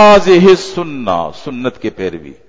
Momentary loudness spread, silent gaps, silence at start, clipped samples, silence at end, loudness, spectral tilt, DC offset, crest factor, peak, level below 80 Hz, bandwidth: 16 LU; none; 0 s; 0.5%; 0.15 s; -12 LUFS; -5.5 dB/octave; under 0.1%; 10 dB; 0 dBFS; -40 dBFS; 7.8 kHz